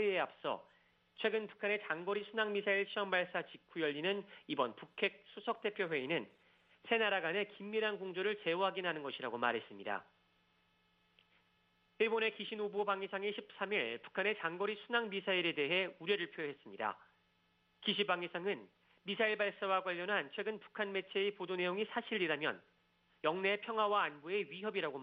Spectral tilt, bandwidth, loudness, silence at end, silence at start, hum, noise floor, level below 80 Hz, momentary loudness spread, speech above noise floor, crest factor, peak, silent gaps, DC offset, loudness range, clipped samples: -7 dB/octave; 5.2 kHz; -38 LUFS; 0 s; 0 s; none; -76 dBFS; -86 dBFS; 8 LU; 38 dB; 20 dB; -18 dBFS; none; under 0.1%; 3 LU; under 0.1%